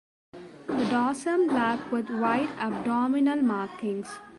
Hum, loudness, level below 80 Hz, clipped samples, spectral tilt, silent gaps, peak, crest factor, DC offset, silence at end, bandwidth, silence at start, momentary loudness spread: none; -27 LUFS; -66 dBFS; under 0.1%; -5.5 dB/octave; none; -12 dBFS; 14 dB; under 0.1%; 0 s; 11.5 kHz; 0.35 s; 9 LU